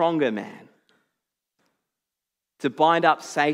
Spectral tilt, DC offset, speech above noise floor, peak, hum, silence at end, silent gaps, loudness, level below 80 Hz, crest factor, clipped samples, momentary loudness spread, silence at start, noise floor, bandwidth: -5 dB/octave; under 0.1%; 65 dB; -4 dBFS; none; 0 s; none; -22 LUFS; -88 dBFS; 22 dB; under 0.1%; 14 LU; 0 s; -86 dBFS; 14 kHz